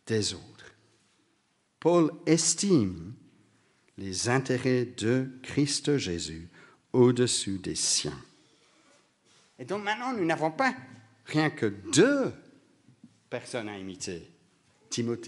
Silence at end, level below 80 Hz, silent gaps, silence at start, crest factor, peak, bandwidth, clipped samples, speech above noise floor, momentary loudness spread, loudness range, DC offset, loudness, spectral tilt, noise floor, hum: 0 s; -64 dBFS; none; 0.05 s; 22 dB; -8 dBFS; 11.5 kHz; under 0.1%; 44 dB; 16 LU; 4 LU; under 0.1%; -28 LUFS; -4 dB/octave; -72 dBFS; none